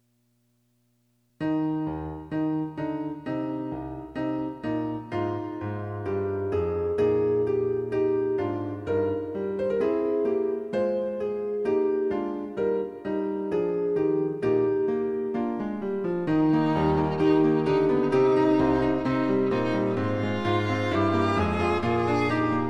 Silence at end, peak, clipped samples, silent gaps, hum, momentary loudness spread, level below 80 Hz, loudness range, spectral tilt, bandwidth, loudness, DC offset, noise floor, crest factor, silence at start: 0 s; -12 dBFS; under 0.1%; none; none; 9 LU; -52 dBFS; 8 LU; -8 dB/octave; 8.4 kHz; -26 LUFS; under 0.1%; -69 dBFS; 14 dB; 1.4 s